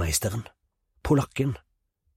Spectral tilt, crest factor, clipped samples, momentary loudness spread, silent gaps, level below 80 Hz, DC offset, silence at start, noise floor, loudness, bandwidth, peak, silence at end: -5 dB/octave; 20 dB; under 0.1%; 15 LU; none; -42 dBFS; under 0.1%; 0 s; -73 dBFS; -27 LUFS; 16 kHz; -10 dBFS; 0.6 s